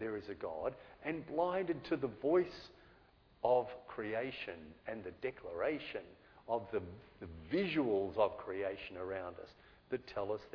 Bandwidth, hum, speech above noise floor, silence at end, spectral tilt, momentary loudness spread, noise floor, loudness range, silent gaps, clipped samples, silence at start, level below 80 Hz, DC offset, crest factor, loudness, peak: 5.4 kHz; none; 28 dB; 0 s; -4.5 dB/octave; 16 LU; -66 dBFS; 5 LU; none; under 0.1%; 0 s; -68 dBFS; under 0.1%; 20 dB; -39 LUFS; -20 dBFS